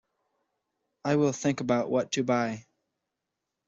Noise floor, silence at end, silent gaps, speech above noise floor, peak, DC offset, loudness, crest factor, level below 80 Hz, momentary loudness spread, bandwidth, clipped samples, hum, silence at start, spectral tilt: -85 dBFS; 1.05 s; none; 58 dB; -12 dBFS; under 0.1%; -28 LUFS; 18 dB; -70 dBFS; 8 LU; 8 kHz; under 0.1%; none; 1.05 s; -5.5 dB/octave